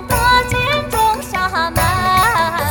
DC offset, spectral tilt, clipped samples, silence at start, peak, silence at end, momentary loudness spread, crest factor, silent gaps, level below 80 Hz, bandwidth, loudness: under 0.1%; -3.5 dB/octave; under 0.1%; 0 s; 0 dBFS; 0 s; 4 LU; 14 dB; none; -30 dBFS; over 20 kHz; -15 LUFS